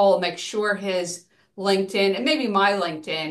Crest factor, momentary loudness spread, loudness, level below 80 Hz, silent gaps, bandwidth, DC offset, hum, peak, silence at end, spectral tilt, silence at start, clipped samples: 18 dB; 8 LU; -23 LUFS; -74 dBFS; none; 12.5 kHz; under 0.1%; none; -6 dBFS; 0 s; -4 dB/octave; 0 s; under 0.1%